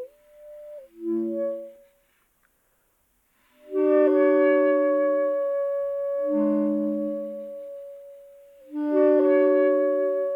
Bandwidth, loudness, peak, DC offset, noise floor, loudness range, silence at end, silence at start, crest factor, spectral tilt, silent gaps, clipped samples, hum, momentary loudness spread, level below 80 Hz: 3.6 kHz; -23 LUFS; -10 dBFS; under 0.1%; -68 dBFS; 12 LU; 0 s; 0 s; 14 dB; -8.5 dB/octave; none; under 0.1%; none; 22 LU; -76 dBFS